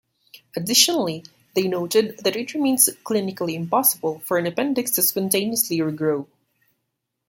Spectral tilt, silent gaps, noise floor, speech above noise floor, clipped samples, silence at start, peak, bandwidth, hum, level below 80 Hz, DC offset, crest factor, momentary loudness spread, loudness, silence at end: -3 dB/octave; none; -78 dBFS; 56 dB; under 0.1%; 0.35 s; 0 dBFS; 17 kHz; none; -68 dBFS; under 0.1%; 22 dB; 10 LU; -21 LUFS; 1.05 s